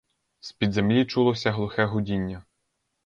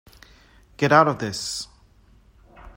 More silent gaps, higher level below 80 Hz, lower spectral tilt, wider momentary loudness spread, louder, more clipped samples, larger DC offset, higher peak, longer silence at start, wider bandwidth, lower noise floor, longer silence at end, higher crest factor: neither; about the same, -52 dBFS vs -54 dBFS; first, -7 dB/octave vs -4.5 dB/octave; first, 18 LU vs 15 LU; second, -25 LUFS vs -21 LUFS; neither; neither; second, -10 dBFS vs -2 dBFS; second, 0.45 s vs 0.8 s; second, 7.4 kHz vs 16 kHz; first, -77 dBFS vs -55 dBFS; first, 0.65 s vs 0.05 s; second, 16 dB vs 24 dB